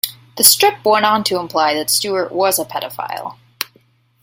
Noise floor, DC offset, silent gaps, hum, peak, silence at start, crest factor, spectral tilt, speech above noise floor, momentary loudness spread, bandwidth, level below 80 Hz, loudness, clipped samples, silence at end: -55 dBFS; under 0.1%; none; none; 0 dBFS; 0.05 s; 18 dB; -1 dB/octave; 39 dB; 17 LU; 17 kHz; -64 dBFS; -15 LUFS; 0.1%; 0.6 s